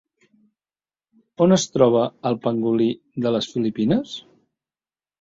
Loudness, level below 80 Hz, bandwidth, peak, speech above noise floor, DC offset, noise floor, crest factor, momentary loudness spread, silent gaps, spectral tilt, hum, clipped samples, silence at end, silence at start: -21 LUFS; -62 dBFS; 7.8 kHz; -4 dBFS; over 70 dB; under 0.1%; under -90 dBFS; 20 dB; 7 LU; none; -6 dB/octave; none; under 0.1%; 1 s; 1.4 s